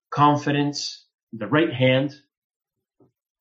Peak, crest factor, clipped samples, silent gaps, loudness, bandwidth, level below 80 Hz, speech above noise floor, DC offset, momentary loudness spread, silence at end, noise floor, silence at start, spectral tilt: -4 dBFS; 18 dB; under 0.1%; 1.14-1.27 s; -22 LUFS; 8 kHz; -66 dBFS; 43 dB; under 0.1%; 16 LU; 1.25 s; -64 dBFS; 0.1 s; -5.5 dB/octave